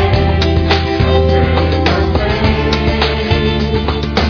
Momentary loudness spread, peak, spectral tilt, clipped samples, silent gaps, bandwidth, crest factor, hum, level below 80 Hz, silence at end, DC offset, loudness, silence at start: 3 LU; -2 dBFS; -7 dB/octave; under 0.1%; none; 5.4 kHz; 10 dB; none; -20 dBFS; 0 s; under 0.1%; -13 LUFS; 0 s